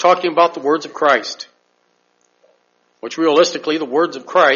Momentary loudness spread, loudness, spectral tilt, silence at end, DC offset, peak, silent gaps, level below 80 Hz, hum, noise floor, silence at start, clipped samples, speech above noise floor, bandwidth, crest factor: 16 LU; -16 LUFS; -1 dB/octave; 0 s; under 0.1%; 0 dBFS; none; -70 dBFS; none; -62 dBFS; 0 s; under 0.1%; 47 dB; 7.4 kHz; 18 dB